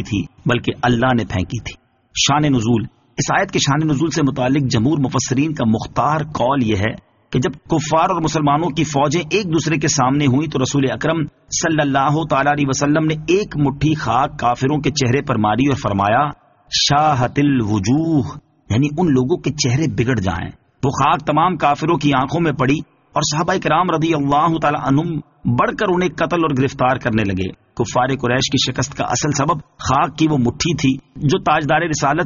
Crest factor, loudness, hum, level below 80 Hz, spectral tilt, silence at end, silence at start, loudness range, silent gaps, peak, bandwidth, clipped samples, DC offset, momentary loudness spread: 14 dB; -17 LUFS; none; -42 dBFS; -5 dB/octave; 0 s; 0 s; 2 LU; none; -2 dBFS; 7.4 kHz; under 0.1%; under 0.1%; 6 LU